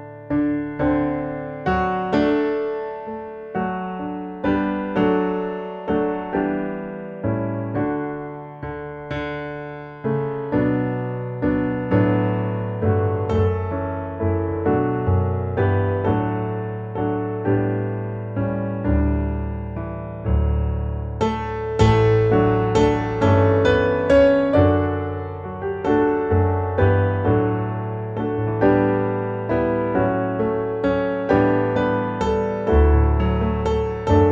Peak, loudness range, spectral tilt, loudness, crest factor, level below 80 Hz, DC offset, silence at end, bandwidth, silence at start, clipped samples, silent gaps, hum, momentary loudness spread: -4 dBFS; 7 LU; -8.5 dB/octave; -21 LUFS; 16 dB; -32 dBFS; under 0.1%; 0 s; 7.6 kHz; 0 s; under 0.1%; none; none; 11 LU